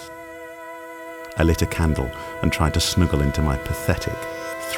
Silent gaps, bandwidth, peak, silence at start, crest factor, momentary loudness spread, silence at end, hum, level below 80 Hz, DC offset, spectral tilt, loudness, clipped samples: none; 18.5 kHz; -4 dBFS; 0 s; 18 dB; 17 LU; 0 s; none; -30 dBFS; under 0.1%; -5 dB/octave; -22 LUFS; under 0.1%